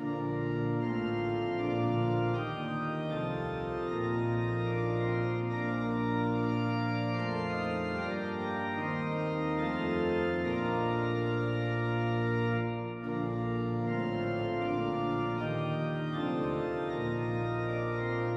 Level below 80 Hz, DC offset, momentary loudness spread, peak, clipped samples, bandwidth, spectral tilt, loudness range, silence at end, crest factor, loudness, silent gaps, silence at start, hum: -58 dBFS; under 0.1%; 4 LU; -18 dBFS; under 0.1%; 7.4 kHz; -8.5 dB/octave; 2 LU; 0 s; 12 dB; -32 LUFS; none; 0 s; none